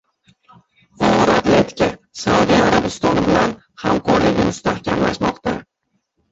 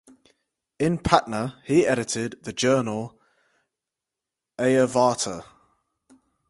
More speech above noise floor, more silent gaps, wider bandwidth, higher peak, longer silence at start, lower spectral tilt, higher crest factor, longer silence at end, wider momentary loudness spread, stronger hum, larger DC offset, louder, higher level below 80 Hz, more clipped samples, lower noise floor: second, 54 dB vs 64 dB; neither; second, 8 kHz vs 11.5 kHz; about the same, -2 dBFS vs 0 dBFS; first, 1 s vs 0.8 s; about the same, -5.5 dB/octave vs -5 dB/octave; second, 16 dB vs 26 dB; second, 0.7 s vs 1.05 s; about the same, 9 LU vs 11 LU; neither; neither; first, -17 LUFS vs -23 LUFS; first, -40 dBFS vs -52 dBFS; neither; second, -70 dBFS vs -87 dBFS